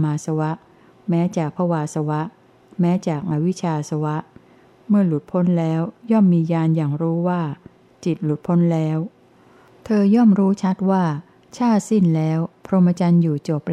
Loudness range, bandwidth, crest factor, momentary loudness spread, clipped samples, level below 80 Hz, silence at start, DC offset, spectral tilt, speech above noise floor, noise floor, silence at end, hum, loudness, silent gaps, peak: 4 LU; 9.8 kHz; 14 dB; 10 LU; under 0.1%; -64 dBFS; 0 s; under 0.1%; -8.5 dB/octave; 32 dB; -51 dBFS; 0 s; none; -20 LUFS; none; -6 dBFS